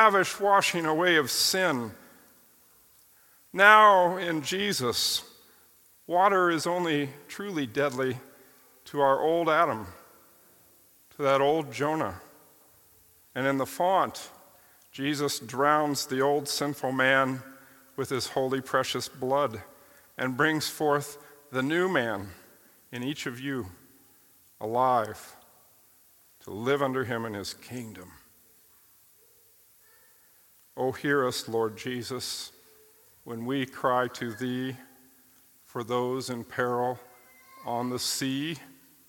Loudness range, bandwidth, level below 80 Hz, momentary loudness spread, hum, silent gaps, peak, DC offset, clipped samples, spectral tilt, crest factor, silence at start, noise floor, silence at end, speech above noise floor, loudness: 10 LU; 17.5 kHz; -72 dBFS; 17 LU; none; none; -2 dBFS; under 0.1%; under 0.1%; -3.5 dB/octave; 26 dB; 0 s; -60 dBFS; 0.4 s; 33 dB; -27 LUFS